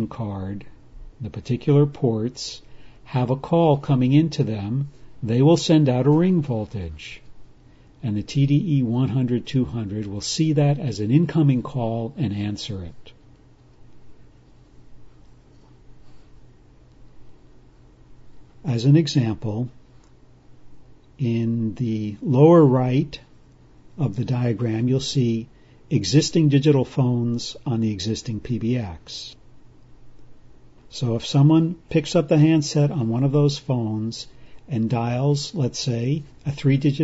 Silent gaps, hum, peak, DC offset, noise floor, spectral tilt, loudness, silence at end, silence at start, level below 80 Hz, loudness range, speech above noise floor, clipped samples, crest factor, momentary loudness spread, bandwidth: none; none; -4 dBFS; under 0.1%; -51 dBFS; -7 dB/octave; -21 LUFS; 0 s; 0 s; -50 dBFS; 7 LU; 30 dB; under 0.1%; 18 dB; 15 LU; 8 kHz